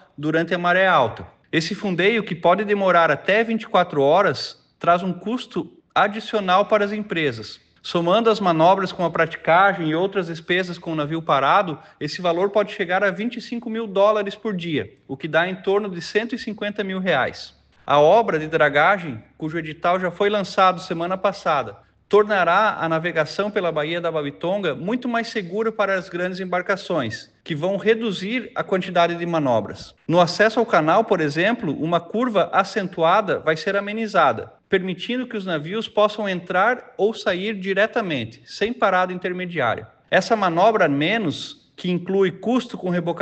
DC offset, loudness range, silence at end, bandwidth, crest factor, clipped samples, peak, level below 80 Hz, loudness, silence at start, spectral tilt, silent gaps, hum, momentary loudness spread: under 0.1%; 4 LU; 0 s; 8.6 kHz; 16 dB; under 0.1%; -4 dBFS; -62 dBFS; -21 LUFS; 0.2 s; -6 dB/octave; none; none; 10 LU